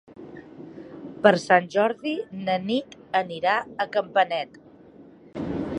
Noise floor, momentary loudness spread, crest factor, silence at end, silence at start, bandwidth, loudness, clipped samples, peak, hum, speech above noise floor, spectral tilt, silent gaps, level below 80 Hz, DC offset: -49 dBFS; 22 LU; 24 dB; 0 s; 0.1 s; 10.5 kHz; -24 LUFS; under 0.1%; -2 dBFS; none; 26 dB; -5.5 dB/octave; none; -58 dBFS; under 0.1%